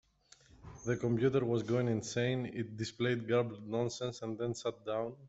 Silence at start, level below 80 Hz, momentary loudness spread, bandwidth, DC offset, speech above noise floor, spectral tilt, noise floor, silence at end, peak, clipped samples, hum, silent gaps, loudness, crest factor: 0.6 s; -66 dBFS; 9 LU; 8.2 kHz; under 0.1%; 30 dB; -6 dB/octave; -65 dBFS; 0 s; -18 dBFS; under 0.1%; none; none; -35 LUFS; 16 dB